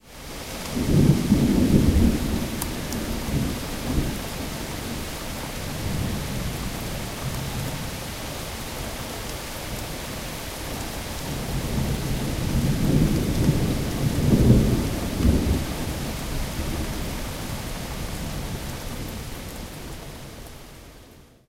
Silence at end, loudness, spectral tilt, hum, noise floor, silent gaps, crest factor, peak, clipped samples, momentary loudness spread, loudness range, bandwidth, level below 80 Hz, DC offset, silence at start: 0.25 s; -26 LUFS; -5.5 dB/octave; none; -49 dBFS; none; 22 dB; -4 dBFS; under 0.1%; 14 LU; 10 LU; 16 kHz; -32 dBFS; under 0.1%; 0.05 s